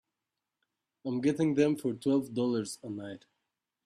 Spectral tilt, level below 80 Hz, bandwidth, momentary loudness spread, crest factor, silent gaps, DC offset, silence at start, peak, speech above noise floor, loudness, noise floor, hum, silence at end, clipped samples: -6.5 dB/octave; -74 dBFS; 14 kHz; 15 LU; 18 dB; none; under 0.1%; 1.05 s; -14 dBFS; 58 dB; -31 LUFS; -88 dBFS; none; 0.7 s; under 0.1%